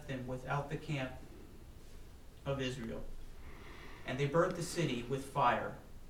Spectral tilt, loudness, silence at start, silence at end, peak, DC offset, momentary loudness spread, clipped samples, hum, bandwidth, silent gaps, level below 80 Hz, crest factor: -5.5 dB/octave; -37 LUFS; 0 s; 0 s; -20 dBFS; under 0.1%; 24 LU; under 0.1%; none; 16.5 kHz; none; -52 dBFS; 20 dB